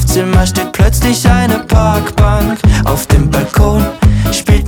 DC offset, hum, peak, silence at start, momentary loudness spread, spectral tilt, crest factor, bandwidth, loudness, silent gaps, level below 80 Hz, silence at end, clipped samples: under 0.1%; none; 0 dBFS; 0 s; 2 LU; -5.5 dB/octave; 10 dB; 19.5 kHz; -11 LUFS; none; -14 dBFS; 0 s; under 0.1%